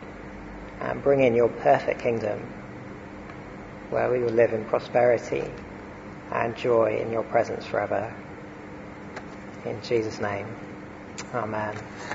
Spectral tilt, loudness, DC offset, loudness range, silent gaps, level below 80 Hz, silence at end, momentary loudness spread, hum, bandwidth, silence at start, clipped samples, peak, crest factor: -6.5 dB/octave; -26 LUFS; under 0.1%; 7 LU; none; -52 dBFS; 0 s; 18 LU; none; 8 kHz; 0 s; under 0.1%; -8 dBFS; 20 dB